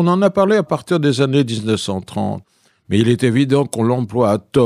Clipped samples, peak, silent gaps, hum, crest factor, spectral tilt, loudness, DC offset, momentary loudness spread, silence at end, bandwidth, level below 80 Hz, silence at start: under 0.1%; -2 dBFS; none; none; 14 dB; -6.5 dB/octave; -17 LUFS; under 0.1%; 9 LU; 0 s; 14.5 kHz; -54 dBFS; 0 s